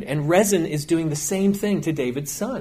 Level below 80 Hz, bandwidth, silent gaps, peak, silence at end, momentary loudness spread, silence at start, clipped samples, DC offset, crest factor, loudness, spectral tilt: -52 dBFS; 16 kHz; none; -6 dBFS; 0 s; 8 LU; 0 s; under 0.1%; under 0.1%; 16 dB; -22 LUFS; -5 dB/octave